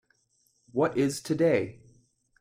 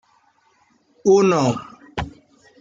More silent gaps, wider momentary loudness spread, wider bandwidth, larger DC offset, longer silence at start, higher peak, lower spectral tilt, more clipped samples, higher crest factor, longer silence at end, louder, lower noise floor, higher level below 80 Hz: neither; second, 9 LU vs 17 LU; first, 16 kHz vs 7.6 kHz; neither; second, 0.75 s vs 1.05 s; second, -12 dBFS vs -4 dBFS; about the same, -6 dB/octave vs -6 dB/octave; neither; about the same, 18 dB vs 16 dB; first, 0.7 s vs 0.5 s; second, -28 LUFS vs -19 LUFS; first, -70 dBFS vs -60 dBFS; second, -66 dBFS vs -48 dBFS